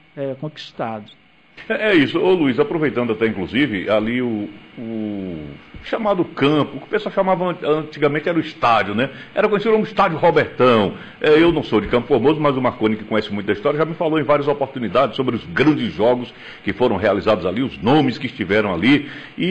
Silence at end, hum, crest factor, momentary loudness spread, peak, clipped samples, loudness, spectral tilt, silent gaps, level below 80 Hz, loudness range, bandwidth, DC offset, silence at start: 0 s; none; 14 dB; 12 LU; -6 dBFS; under 0.1%; -18 LUFS; -7.5 dB/octave; none; -48 dBFS; 5 LU; 8.4 kHz; 0.2%; 0.15 s